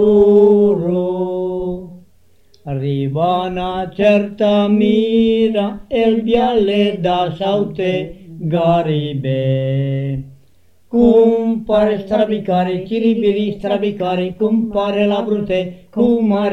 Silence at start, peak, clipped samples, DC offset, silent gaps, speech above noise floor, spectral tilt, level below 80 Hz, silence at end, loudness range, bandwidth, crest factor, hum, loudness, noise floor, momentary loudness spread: 0 s; 0 dBFS; under 0.1%; 0.4%; none; 41 dB; -8.5 dB/octave; -44 dBFS; 0 s; 4 LU; 6.4 kHz; 14 dB; none; -16 LUFS; -56 dBFS; 9 LU